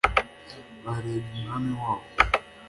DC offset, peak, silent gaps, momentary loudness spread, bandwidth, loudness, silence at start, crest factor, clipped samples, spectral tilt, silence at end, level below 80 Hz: under 0.1%; -2 dBFS; none; 17 LU; 11.5 kHz; -28 LUFS; 0.05 s; 26 dB; under 0.1%; -5.5 dB/octave; 0 s; -42 dBFS